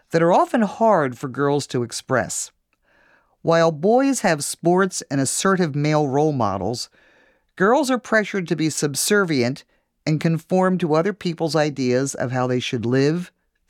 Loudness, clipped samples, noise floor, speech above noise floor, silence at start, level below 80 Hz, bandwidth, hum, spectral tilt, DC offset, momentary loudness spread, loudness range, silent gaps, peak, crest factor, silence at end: -20 LUFS; under 0.1%; -61 dBFS; 41 dB; 0.1 s; -64 dBFS; 17 kHz; none; -5 dB/octave; under 0.1%; 8 LU; 2 LU; none; -6 dBFS; 14 dB; 0.4 s